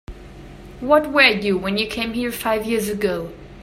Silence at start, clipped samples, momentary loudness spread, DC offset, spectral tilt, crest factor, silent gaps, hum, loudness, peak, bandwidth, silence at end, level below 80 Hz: 0.1 s; under 0.1%; 11 LU; under 0.1%; -4 dB/octave; 20 dB; none; none; -19 LUFS; 0 dBFS; 16 kHz; 0 s; -44 dBFS